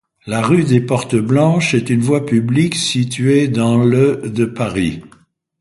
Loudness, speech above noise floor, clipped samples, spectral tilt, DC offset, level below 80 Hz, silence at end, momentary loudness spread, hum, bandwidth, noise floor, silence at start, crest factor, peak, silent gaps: -15 LUFS; 37 dB; under 0.1%; -6 dB/octave; under 0.1%; -46 dBFS; 0.55 s; 6 LU; none; 11.5 kHz; -51 dBFS; 0.25 s; 14 dB; 0 dBFS; none